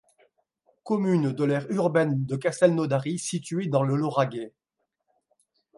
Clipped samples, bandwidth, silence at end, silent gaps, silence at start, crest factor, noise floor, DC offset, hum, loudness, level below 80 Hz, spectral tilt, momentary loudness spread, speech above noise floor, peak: under 0.1%; 11.5 kHz; 1.3 s; none; 0.85 s; 20 dB; -81 dBFS; under 0.1%; none; -25 LUFS; -72 dBFS; -6.5 dB/octave; 7 LU; 56 dB; -8 dBFS